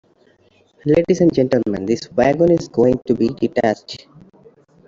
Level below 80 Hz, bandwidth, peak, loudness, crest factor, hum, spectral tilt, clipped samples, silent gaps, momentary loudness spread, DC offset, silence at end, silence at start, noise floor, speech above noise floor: -48 dBFS; 7.6 kHz; -2 dBFS; -17 LUFS; 16 dB; none; -7 dB/octave; under 0.1%; none; 10 LU; under 0.1%; 0.9 s; 0.85 s; -55 dBFS; 39 dB